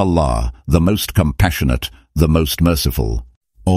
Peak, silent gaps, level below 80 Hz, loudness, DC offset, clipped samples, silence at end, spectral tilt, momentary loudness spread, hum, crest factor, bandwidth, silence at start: 0 dBFS; 3.37-3.41 s; -24 dBFS; -17 LUFS; under 0.1%; under 0.1%; 0 s; -6 dB/octave; 8 LU; none; 16 dB; 16 kHz; 0 s